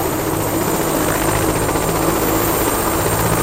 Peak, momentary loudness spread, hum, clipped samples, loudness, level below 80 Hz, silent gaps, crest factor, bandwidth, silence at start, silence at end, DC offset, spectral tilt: -2 dBFS; 2 LU; none; under 0.1%; -17 LUFS; -32 dBFS; none; 14 dB; 16 kHz; 0 s; 0 s; under 0.1%; -4.5 dB/octave